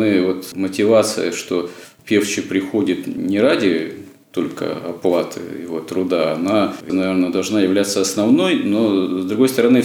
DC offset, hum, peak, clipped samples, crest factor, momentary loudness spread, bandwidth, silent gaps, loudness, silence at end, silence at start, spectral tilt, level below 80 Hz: under 0.1%; none; -2 dBFS; under 0.1%; 14 dB; 10 LU; 18 kHz; none; -18 LUFS; 0 s; 0 s; -4.5 dB/octave; -66 dBFS